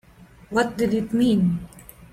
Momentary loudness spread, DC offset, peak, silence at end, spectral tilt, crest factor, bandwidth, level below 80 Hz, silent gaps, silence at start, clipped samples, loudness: 10 LU; under 0.1%; -8 dBFS; 0.1 s; -7 dB/octave; 16 dB; 15.5 kHz; -50 dBFS; none; 0.2 s; under 0.1%; -22 LUFS